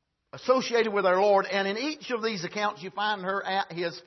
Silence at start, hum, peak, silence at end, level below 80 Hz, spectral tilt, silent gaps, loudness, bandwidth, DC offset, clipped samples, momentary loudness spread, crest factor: 0.35 s; none; -8 dBFS; 0.05 s; -78 dBFS; -4 dB/octave; none; -27 LUFS; 6.2 kHz; under 0.1%; under 0.1%; 8 LU; 18 dB